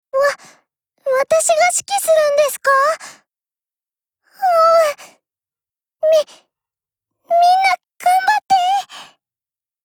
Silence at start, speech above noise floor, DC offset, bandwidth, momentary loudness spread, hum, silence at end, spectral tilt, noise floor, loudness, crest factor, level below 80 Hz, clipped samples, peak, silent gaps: 0.15 s; over 76 dB; under 0.1%; over 20 kHz; 9 LU; none; 0.8 s; 0.5 dB/octave; under -90 dBFS; -15 LUFS; 16 dB; -68 dBFS; under 0.1%; -2 dBFS; none